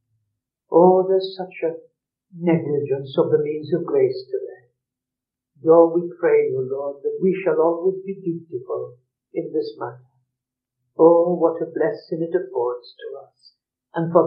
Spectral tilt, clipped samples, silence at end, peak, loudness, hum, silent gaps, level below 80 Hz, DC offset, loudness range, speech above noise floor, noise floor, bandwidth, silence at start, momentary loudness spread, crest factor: -7 dB/octave; under 0.1%; 0 s; -2 dBFS; -21 LUFS; none; none; -86 dBFS; under 0.1%; 4 LU; 67 dB; -86 dBFS; 5.4 kHz; 0.7 s; 17 LU; 20 dB